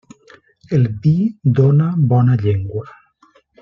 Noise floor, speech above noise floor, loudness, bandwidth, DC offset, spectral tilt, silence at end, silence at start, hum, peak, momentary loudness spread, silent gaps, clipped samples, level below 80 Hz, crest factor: -54 dBFS; 40 dB; -16 LUFS; 5.8 kHz; under 0.1%; -10.5 dB/octave; 0.75 s; 0.7 s; none; -2 dBFS; 8 LU; none; under 0.1%; -50 dBFS; 14 dB